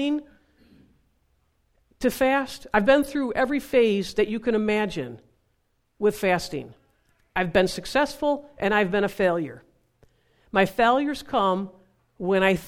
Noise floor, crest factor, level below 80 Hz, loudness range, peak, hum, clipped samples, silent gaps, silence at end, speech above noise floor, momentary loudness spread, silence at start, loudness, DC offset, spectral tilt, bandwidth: -71 dBFS; 20 dB; -52 dBFS; 4 LU; -6 dBFS; none; under 0.1%; none; 0 s; 48 dB; 10 LU; 0 s; -24 LUFS; under 0.1%; -5.5 dB/octave; 16.5 kHz